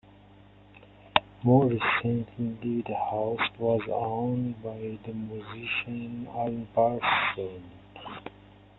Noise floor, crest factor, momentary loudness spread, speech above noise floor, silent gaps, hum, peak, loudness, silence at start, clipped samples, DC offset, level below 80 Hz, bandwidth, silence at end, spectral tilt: -54 dBFS; 26 dB; 16 LU; 26 dB; none; 50 Hz at -55 dBFS; -4 dBFS; -29 LUFS; 0.75 s; under 0.1%; under 0.1%; -60 dBFS; 4.2 kHz; 0.5 s; -9.5 dB/octave